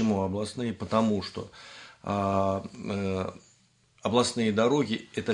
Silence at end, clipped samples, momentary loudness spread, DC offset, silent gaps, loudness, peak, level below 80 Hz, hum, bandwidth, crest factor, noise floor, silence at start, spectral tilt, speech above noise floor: 0 s; under 0.1%; 14 LU; under 0.1%; none; -28 LUFS; -8 dBFS; -66 dBFS; none; 10.5 kHz; 20 dB; -64 dBFS; 0 s; -5.5 dB/octave; 36 dB